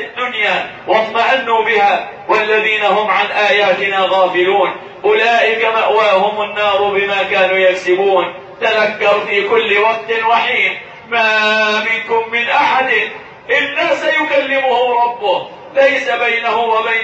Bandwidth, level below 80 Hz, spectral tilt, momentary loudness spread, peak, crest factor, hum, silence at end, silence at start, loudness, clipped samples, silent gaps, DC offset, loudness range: 8.2 kHz; -60 dBFS; -3.5 dB/octave; 5 LU; 0 dBFS; 14 dB; none; 0 s; 0 s; -13 LUFS; under 0.1%; none; under 0.1%; 1 LU